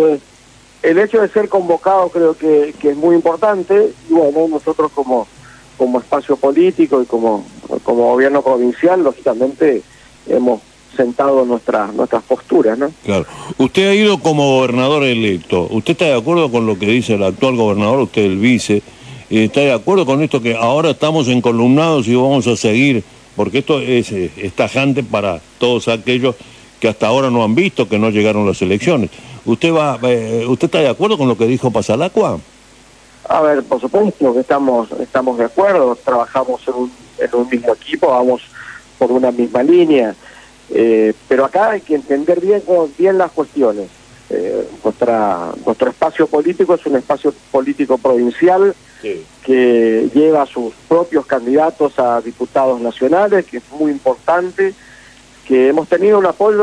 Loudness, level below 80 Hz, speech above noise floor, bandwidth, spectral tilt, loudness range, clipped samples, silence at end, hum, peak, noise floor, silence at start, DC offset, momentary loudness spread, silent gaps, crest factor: -14 LUFS; -52 dBFS; 31 dB; 11 kHz; -6 dB/octave; 3 LU; under 0.1%; 0 s; none; -2 dBFS; -44 dBFS; 0 s; under 0.1%; 7 LU; none; 12 dB